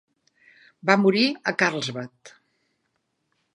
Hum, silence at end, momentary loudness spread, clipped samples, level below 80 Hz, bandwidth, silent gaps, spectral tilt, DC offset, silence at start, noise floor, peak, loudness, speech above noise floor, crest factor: none; 1.25 s; 15 LU; under 0.1%; -76 dBFS; 11.5 kHz; none; -5 dB/octave; under 0.1%; 0.85 s; -75 dBFS; -2 dBFS; -22 LUFS; 52 dB; 24 dB